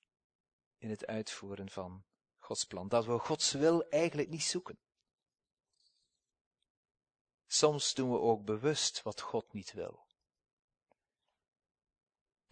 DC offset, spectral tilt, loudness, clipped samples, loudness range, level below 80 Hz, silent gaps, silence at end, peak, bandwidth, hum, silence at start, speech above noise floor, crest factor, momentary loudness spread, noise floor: under 0.1%; -3.5 dB/octave; -34 LUFS; under 0.1%; 10 LU; -76 dBFS; 6.41-6.51 s, 6.70-6.83 s, 6.91-6.95 s, 7.21-7.25 s, 7.34-7.38 s; 2.6 s; -12 dBFS; 9.6 kHz; none; 0.8 s; 54 dB; 26 dB; 15 LU; -88 dBFS